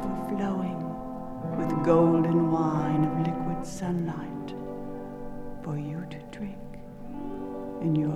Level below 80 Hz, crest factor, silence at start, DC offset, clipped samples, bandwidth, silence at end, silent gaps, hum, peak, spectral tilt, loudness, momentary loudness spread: -48 dBFS; 20 dB; 0 s; under 0.1%; under 0.1%; 12.5 kHz; 0 s; none; none; -8 dBFS; -8.5 dB/octave; -29 LUFS; 16 LU